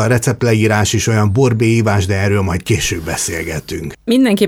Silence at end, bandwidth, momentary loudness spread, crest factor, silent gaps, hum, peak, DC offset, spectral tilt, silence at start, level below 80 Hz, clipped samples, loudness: 0 s; 16.5 kHz; 9 LU; 12 dB; none; none; -2 dBFS; under 0.1%; -5 dB/octave; 0 s; -36 dBFS; under 0.1%; -15 LUFS